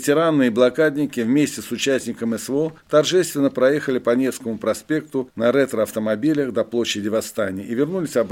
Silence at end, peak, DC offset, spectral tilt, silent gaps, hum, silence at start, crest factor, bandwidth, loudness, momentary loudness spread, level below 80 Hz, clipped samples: 0 s; -4 dBFS; under 0.1%; -5 dB/octave; none; none; 0 s; 16 dB; 17 kHz; -20 LUFS; 7 LU; -62 dBFS; under 0.1%